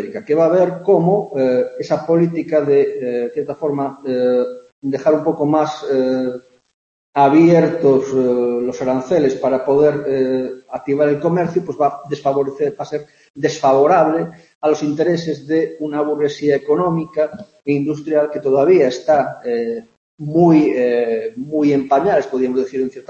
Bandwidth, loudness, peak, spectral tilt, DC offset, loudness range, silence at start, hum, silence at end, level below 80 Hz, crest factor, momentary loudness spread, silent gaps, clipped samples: 7.4 kHz; -17 LUFS; -2 dBFS; -7.5 dB/octave; under 0.1%; 3 LU; 0 s; none; 0.1 s; -60 dBFS; 14 dB; 9 LU; 4.72-4.82 s, 6.74-7.13 s, 13.30-13.34 s, 14.55-14.61 s, 19.97-20.18 s; under 0.1%